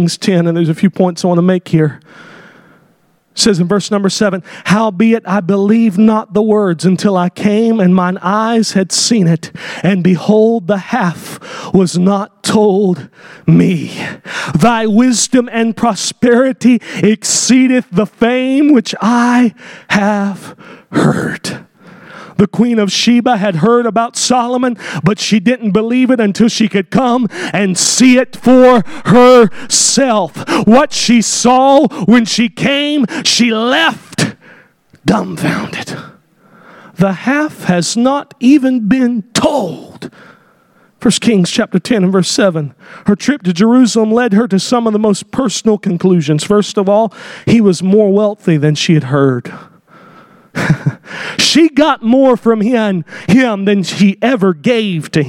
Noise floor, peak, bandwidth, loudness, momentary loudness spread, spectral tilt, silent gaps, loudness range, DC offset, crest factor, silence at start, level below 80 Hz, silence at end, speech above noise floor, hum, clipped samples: -53 dBFS; 0 dBFS; 15.5 kHz; -11 LUFS; 8 LU; -5 dB/octave; none; 6 LU; under 0.1%; 12 dB; 0 s; -50 dBFS; 0 s; 42 dB; none; under 0.1%